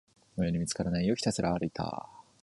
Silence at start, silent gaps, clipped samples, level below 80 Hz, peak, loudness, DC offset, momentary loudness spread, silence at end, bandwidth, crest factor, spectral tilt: 0.35 s; none; under 0.1%; -52 dBFS; -14 dBFS; -32 LUFS; under 0.1%; 13 LU; 0.2 s; 11.5 kHz; 18 dB; -5.5 dB/octave